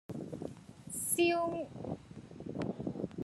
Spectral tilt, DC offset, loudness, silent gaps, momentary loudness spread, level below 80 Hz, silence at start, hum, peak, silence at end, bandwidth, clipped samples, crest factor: -4 dB/octave; under 0.1%; -36 LUFS; none; 17 LU; -66 dBFS; 0.1 s; none; -20 dBFS; 0 s; 13 kHz; under 0.1%; 18 dB